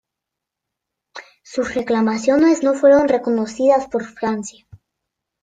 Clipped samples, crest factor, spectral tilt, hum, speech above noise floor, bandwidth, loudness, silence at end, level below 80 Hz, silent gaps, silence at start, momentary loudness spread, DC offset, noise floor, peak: under 0.1%; 16 dB; -5 dB/octave; none; 67 dB; 9.2 kHz; -17 LUFS; 0.9 s; -56 dBFS; none; 1.15 s; 14 LU; under 0.1%; -83 dBFS; -2 dBFS